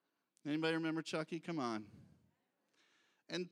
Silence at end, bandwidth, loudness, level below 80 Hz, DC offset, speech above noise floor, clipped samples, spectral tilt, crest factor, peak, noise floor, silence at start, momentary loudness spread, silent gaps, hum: 0.05 s; 11 kHz; -41 LUFS; -88 dBFS; under 0.1%; 41 dB; under 0.1%; -5.5 dB/octave; 20 dB; -24 dBFS; -81 dBFS; 0.45 s; 10 LU; none; none